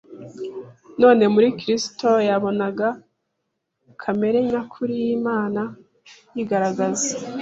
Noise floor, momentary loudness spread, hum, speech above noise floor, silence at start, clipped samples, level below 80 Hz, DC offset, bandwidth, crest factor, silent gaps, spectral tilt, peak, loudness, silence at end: -77 dBFS; 18 LU; none; 56 dB; 0.1 s; under 0.1%; -64 dBFS; under 0.1%; 8 kHz; 20 dB; none; -4.5 dB/octave; -2 dBFS; -21 LUFS; 0 s